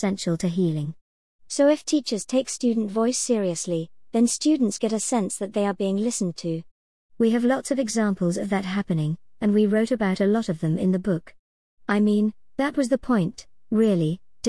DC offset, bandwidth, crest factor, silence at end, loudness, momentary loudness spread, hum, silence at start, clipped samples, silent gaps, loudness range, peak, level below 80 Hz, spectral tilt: 0.3%; 12 kHz; 14 dB; 0 s; -24 LUFS; 7 LU; none; 0 s; under 0.1%; 1.01-1.39 s, 6.71-7.09 s, 11.39-11.77 s; 2 LU; -8 dBFS; -58 dBFS; -5.5 dB/octave